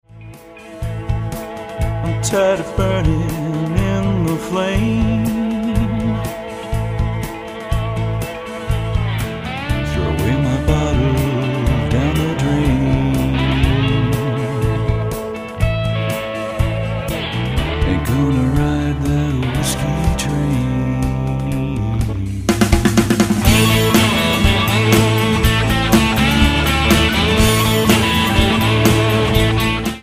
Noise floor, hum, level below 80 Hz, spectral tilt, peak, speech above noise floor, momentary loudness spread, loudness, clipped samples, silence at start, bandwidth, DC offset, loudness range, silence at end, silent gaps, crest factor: -37 dBFS; none; -24 dBFS; -5.5 dB/octave; 0 dBFS; 20 dB; 10 LU; -17 LUFS; under 0.1%; 0.15 s; 16 kHz; under 0.1%; 7 LU; 0 s; none; 16 dB